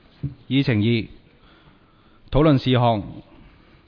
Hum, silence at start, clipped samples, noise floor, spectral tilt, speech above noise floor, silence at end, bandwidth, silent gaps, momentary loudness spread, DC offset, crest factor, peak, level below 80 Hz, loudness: none; 0.25 s; under 0.1%; -54 dBFS; -9 dB/octave; 35 dB; 0.65 s; 5.4 kHz; none; 20 LU; under 0.1%; 18 dB; -4 dBFS; -38 dBFS; -20 LUFS